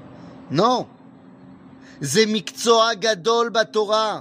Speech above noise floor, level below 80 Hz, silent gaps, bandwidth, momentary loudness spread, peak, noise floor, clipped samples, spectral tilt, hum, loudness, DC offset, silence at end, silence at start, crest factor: 26 dB; -68 dBFS; none; 15.5 kHz; 8 LU; -2 dBFS; -46 dBFS; under 0.1%; -3.5 dB/octave; none; -19 LUFS; under 0.1%; 0 s; 0 s; 18 dB